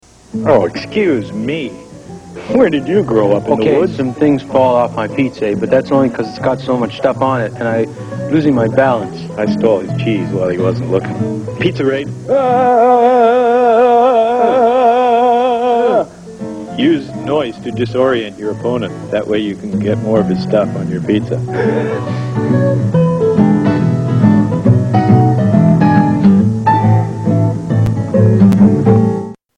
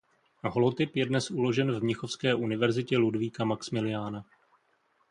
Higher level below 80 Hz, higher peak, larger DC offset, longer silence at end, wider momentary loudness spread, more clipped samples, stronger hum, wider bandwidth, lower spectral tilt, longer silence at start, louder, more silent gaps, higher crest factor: first, -44 dBFS vs -66 dBFS; first, 0 dBFS vs -12 dBFS; neither; second, 0.2 s vs 0.85 s; first, 10 LU vs 6 LU; neither; neither; about the same, 10 kHz vs 10.5 kHz; first, -8.5 dB/octave vs -6 dB/octave; about the same, 0.35 s vs 0.45 s; first, -13 LUFS vs -29 LUFS; neither; second, 12 dB vs 18 dB